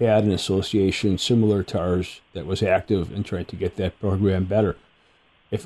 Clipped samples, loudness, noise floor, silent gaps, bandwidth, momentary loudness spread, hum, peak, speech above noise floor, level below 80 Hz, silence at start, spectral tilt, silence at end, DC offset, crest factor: under 0.1%; -23 LUFS; -59 dBFS; none; 12.5 kHz; 10 LU; none; -6 dBFS; 37 dB; -46 dBFS; 0 s; -6.5 dB/octave; 0 s; under 0.1%; 16 dB